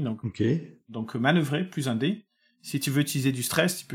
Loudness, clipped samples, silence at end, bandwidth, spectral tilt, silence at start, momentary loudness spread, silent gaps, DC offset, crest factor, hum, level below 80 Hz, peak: -27 LUFS; under 0.1%; 0 s; 18 kHz; -5 dB/octave; 0 s; 12 LU; none; under 0.1%; 20 dB; none; -66 dBFS; -8 dBFS